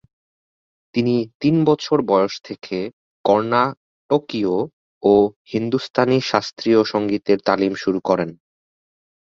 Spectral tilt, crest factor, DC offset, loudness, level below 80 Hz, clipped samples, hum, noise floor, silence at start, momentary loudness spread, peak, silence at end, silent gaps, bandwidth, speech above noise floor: -6.5 dB/octave; 20 dB; under 0.1%; -19 LUFS; -58 dBFS; under 0.1%; none; under -90 dBFS; 0.95 s; 10 LU; 0 dBFS; 0.9 s; 1.35-1.40 s, 2.93-3.24 s, 3.77-4.09 s, 4.73-5.01 s, 5.36-5.45 s, 5.90-5.94 s; 7.4 kHz; over 72 dB